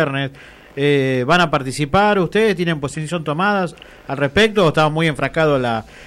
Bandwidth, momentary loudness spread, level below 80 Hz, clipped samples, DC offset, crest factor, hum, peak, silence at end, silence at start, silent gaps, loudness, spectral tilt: 13.5 kHz; 9 LU; -44 dBFS; under 0.1%; under 0.1%; 12 dB; none; -6 dBFS; 0 s; 0 s; none; -17 LUFS; -5.5 dB/octave